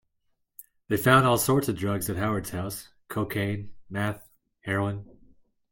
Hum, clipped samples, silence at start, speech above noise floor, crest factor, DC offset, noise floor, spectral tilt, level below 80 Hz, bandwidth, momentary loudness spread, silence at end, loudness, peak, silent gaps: none; under 0.1%; 0.6 s; 48 dB; 22 dB; under 0.1%; -74 dBFS; -5 dB/octave; -56 dBFS; 17 kHz; 17 LU; 0.6 s; -26 LUFS; -6 dBFS; none